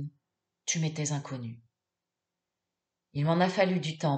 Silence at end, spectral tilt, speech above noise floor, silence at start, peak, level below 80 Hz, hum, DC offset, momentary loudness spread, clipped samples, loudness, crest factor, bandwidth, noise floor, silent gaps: 0 s; -5 dB/octave; 59 dB; 0 s; -10 dBFS; -76 dBFS; none; under 0.1%; 14 LU; under 0.1%; -30 LUFS; 22 dB; 8.8 kHz; -88 dBFS; none